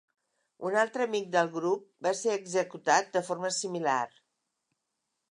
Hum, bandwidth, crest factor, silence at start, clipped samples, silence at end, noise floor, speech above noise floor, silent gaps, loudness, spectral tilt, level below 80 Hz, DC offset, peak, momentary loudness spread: none; 11.5 kHz; 22 dB; 0.6 s; under 0.1%; 1.25 s; -83 dBFS; 54 dB; none; -30 LUFS; -3 dB/octave; -86 dBFS; under 0.1%; -10 dBFS; 6 LU